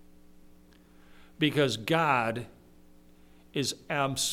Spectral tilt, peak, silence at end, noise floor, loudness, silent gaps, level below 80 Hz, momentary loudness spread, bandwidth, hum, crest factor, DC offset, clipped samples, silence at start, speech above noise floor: -4 dB/octave; -10 dBFS; 0 s; -56 dBFS; -29 LUFS; none; -60 dBFS; 12 LU; 17 kHz; none; 22 dB; under 0.1%; under 0.1%; 0.35 s; 28 dB